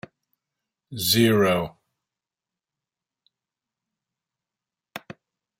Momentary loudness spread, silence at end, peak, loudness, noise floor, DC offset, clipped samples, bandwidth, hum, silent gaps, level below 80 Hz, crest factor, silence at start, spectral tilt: 23 LU; 0.6 s; -6 dBFS; -20 LUFS; -90 dBFS; under 0.1%; under 0.1%; 16 kHz; none; none; -64 dBFS; 22 dB; 0.9 s; -4.5 dB/octave